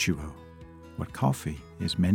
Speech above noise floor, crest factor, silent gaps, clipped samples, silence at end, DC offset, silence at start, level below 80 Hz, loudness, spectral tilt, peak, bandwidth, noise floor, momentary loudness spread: 19 dB; 20 dB; none; under 0.1%; 0 s; under 0.1%; 0 s; -50 dBFS; -31 LUFS; -5.5 dB/octave; -10 dBFS; 17 kHz; -47 dBFS; 19 LU